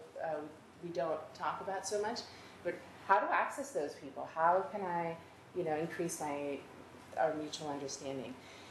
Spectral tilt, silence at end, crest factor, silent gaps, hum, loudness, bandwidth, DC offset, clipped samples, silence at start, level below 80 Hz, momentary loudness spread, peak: -4 dB/octave; 0 s; 24 dB; none; none; -38 LUFS; 13 kHz; under 0.1%; under 0.1%; 0 s; -80 dBFS; 15 LU; -14 dBFS